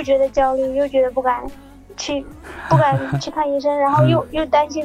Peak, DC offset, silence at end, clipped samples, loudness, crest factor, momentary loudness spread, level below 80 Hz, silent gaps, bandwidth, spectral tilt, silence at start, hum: -2 dBFS; under 0.1%; 0 s; under 0.1%; -18 LUFS; 18 dB; 13 LU; -42 dBFS; none; 11 kHz; -6.5 dB/octave; 0 s; none